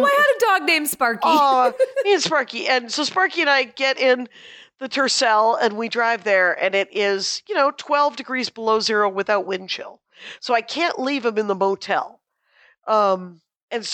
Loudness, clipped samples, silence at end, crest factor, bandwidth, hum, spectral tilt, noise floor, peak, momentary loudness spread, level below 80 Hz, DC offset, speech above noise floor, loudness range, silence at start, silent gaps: -19 LUFS; under 0.1%; 0 s; 14 dB; 18 kHz; none; -2 dB/octave; -58 dBFS; -6 dBFS; 10 LU; -76 dBFS; under 0.1%; 38 dB; 5 LU; 0 s; 13.63-13.68 s